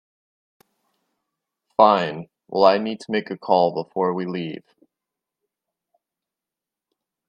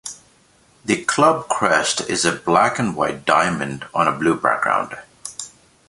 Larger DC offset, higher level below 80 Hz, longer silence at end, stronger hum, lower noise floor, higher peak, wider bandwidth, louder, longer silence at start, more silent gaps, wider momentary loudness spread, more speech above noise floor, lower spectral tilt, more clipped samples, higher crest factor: neither; second, -68 dBFS vs -56 dBFS; first, 2.7 s vs 0.4 s; neither; first, -88 dBFS vs -55 dBFS; about the same, 0 dBFS vs 0 dBFS; second, 9.6 kHz vs 11.5 kHz; second, -21 LUFS vs -18 LUFS; first, 1.8 s vs 0.05 s; neither; about the same, 14 LU vs 16 LU; first, 68 dB vs 36 dB; first, -6.5 dB/octave vs -3.5 dB/octave; neither; about the same, 24 dB vs 20 dB